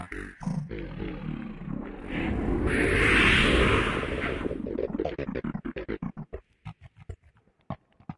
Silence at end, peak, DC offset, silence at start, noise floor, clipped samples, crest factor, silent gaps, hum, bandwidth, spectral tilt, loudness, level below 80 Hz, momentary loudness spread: 0.05 s; -8 dBFS; under 0.1%; 0 s; -62 dBFS; under 0.1%; 20 dB; none; none; 11.5 kHz; -5.5 dB/octave; -27 LUFS; -38 dBFS; 23 LU